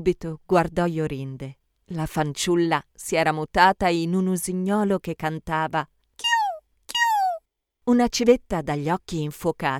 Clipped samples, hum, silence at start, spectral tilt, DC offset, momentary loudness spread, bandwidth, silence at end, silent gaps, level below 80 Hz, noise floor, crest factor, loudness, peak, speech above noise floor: under 0.1%; none; 0 s; -5 dB/octave; under 0.1%; 12 LU; 17 kHz; 0 s; none; -48 dBFS; -55 dBFS; 20 dB; -23 LUFS; -4 dBFS; 32 dB